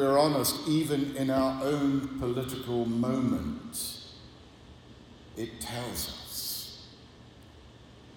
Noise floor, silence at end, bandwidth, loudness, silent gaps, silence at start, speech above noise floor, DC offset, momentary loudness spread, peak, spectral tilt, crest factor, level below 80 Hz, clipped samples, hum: -52 dBFS; 0 s; 17.5 kHz; -30 LUFS; none; 0 s; 23 dB; under 0.1%; 18 LU; -12 dBFS; -5 dB/octave; 20 dB; -56 dBFS; under 0.1%; none